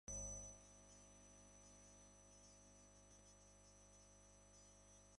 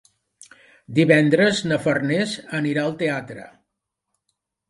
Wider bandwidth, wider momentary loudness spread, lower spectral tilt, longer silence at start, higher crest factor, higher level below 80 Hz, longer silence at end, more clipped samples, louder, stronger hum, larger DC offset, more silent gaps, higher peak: about the same, 11.5 kHz vs 11.5 kHz; first, 14 LU vs 11 LU; second, -3 dB/octave vs -5.5 dB/octave; second, 0.05 s vs 0.9 s; about the same, 20 dB vs 22 dB; about the same, -68 dBFS vs -64 dBFS; second, 0 s vs 1.25 s; neither; second, -60 LUFS vs -20 LUFS; first, 50 Hz at -70 dBFS vs none; neither; neither; second, -40 dBFS vs -2 dBFS